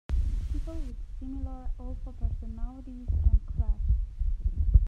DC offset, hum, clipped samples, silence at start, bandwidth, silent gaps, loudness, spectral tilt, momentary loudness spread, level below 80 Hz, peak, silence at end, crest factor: under 0.1%; none; under 0.1%; 0.1 s; 3.4 kHz; none; -33 LUFS; -9.5 dB/octave; 14 LU; -28 dBFS; -6 dBFS; 0 s; 22 dB